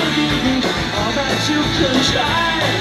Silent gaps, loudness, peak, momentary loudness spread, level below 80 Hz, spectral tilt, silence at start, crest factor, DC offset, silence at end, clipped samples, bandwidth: none; -16 LUFS; -2 dBFS; 4 LU; -34 dBFS; -4 dB/octave; 0 s; 14 dB; under 0.1%; 0 s; under 0.1%; 15.5 kHz